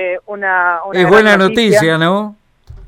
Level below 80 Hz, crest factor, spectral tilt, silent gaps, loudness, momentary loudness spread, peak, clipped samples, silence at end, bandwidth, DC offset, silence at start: -44 dBFS; 12 dB; -5 dB/octave; none; -11 LUFS; 11 LU; 0 dBFS; 0.1%; 0 s; 17 kHz; under 0.1%; 0 s